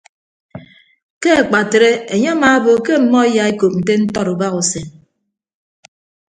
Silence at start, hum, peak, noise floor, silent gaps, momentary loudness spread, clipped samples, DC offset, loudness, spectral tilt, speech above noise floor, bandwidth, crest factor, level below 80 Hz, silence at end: 0.55 s; none; 0 dBFS; -37 dBFS; 1.03-1.21 s; 6 LU; under 0.1%; under 0.1%; -14 LUFS; -4.5 dB/octave; 24 dB; 9.6 kHz; 16 dB; -52 dBFS; 1.4 s